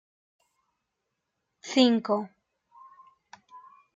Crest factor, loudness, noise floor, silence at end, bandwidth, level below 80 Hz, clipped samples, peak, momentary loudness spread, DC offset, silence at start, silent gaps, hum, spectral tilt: 22 dB; -25 LUFS; -82 dBFS; 0.4 s; 7.8 kHz; -84 dBFS; under 0.1%; -8 dBFS; 22 LU; under 0.1%; 1.65 s; none; none; -4.5 dB/octave